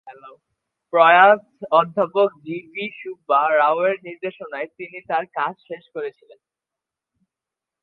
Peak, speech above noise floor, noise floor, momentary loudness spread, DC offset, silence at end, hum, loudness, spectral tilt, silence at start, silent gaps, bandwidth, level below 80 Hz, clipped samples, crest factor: 0 dBFS; 67 dB; -87 dBFS; 19 LU; under 0.1%; 1.75 s; none; -19 LUFS; -7.5 dB/octave; 0.05 s; none; 4.5 kHz; -76 dBFS; under 0.1%; 20 dB